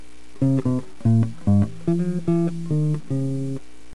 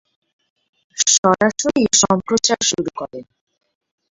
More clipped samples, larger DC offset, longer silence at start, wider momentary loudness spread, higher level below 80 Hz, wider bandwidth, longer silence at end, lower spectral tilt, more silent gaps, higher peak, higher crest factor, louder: neither; first, 3% vs under 0.1%; second, 0.4 s vs 0.95 s; second, 6 LU vs 18 LU; about the same, -50 dBFS vs -54 dBFS; first, 11 kHz vs 8.2 kHz; second, 0.4 s vs 0.9 s; first, -9.5 dB/octave vs -2.5 dB/octave; second, none vs 1.18-1.23 s; second, -8 dBFS vs 0 dBFS; second, 14 dB vs 20 dB; second, -23 LUFS vs -16 LUFS